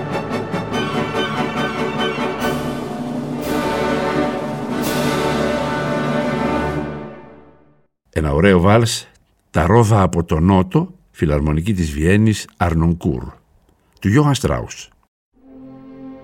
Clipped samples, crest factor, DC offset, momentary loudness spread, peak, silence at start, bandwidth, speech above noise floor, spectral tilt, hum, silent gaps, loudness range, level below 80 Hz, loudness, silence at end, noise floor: under 0.1%; 18 dB; under 0.1%; 11 LU; 0 dBFS; 0 s; 16.5 kHz; 41 dB; -6 dB/octave; none; 15.08-15.32 s; 5 LU; -34 dBFS; -18 LUFS; 0 s; -56 dBFS